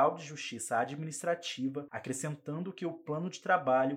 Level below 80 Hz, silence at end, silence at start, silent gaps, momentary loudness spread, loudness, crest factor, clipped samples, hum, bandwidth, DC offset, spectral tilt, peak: -88 dBFS; 0 s; 0 s; none; 10 LU; -35 LUFS; 20 dB; under 0.1%; none; 16 kHz; under 0.1%; -4.5 dB/octave; -14 dBFS